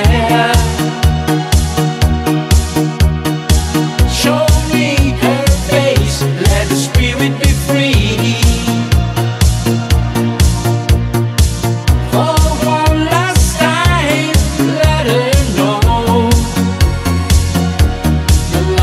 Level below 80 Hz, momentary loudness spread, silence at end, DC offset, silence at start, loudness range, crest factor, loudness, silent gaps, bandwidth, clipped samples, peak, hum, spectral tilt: -16 dBFS; 3 LU; 0 s; under 0.1%; 0 s; 1 LU; 12 dB; -12 LUFS; none; 16 kHz; under 0.1%; 0 dBFS; none; -5 dB/octave